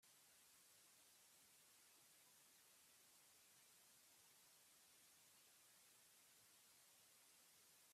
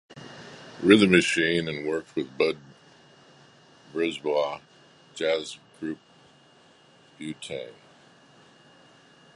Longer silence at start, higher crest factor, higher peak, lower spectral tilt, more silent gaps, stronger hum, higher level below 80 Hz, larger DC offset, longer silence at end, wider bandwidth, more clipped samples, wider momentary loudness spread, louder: about the same, 0 s vs 0.1 s; second, 14 dB vs 26 dB; second, -60 dBFS vs -2 dBFS; second, 0 dB/octave vs -5 dB/octave; neither; neither; second, under -90 dBFS vs -64 dBFS; neither; second, 0 s vs 1.65 s; first, 15.5 kHz vs 11.5 kHz; neither; second, 0 LU vs 24 LU; second, -70 LUFS vs -25 LUFS